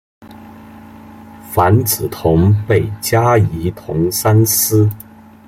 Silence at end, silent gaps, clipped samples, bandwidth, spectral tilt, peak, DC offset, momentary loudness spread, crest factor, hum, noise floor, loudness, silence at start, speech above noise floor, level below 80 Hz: 0.45 s; none; under 0.1%; 16.5 kHz; -5.5 dB/octave; 0 dBFS; under 0.1%; 8 LU; 14 dB; none; -36 dBFS; -14 LUFS; 0.2 s; 23 dB; -40 dBFS